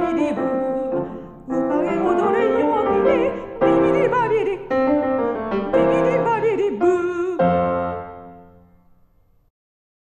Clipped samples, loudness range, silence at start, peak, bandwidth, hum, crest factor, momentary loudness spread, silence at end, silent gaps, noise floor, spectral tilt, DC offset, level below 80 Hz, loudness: under 0.1%; 4 LU; 0 s; -4 dBFS; 8.8 kHz; none; 16 dB; 8 LU; 1.6 s; none; -57 dBFS; -7.5 dB/octave; under 0.1%; -48 dBFS; -20 LUFS